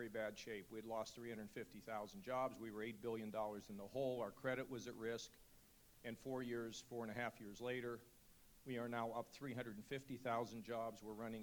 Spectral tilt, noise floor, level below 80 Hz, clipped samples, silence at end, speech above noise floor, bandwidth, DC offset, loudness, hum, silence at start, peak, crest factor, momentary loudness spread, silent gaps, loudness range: -5 dB/octave; -69 dBFS; -76 dBFS; under 0.1%; 0 s; 21 dB; over 20 kHz; under 0.1%; -49 LUFS; none; 0 s; -30 dBFS; 18 dB; 10 LU; none; 3 LU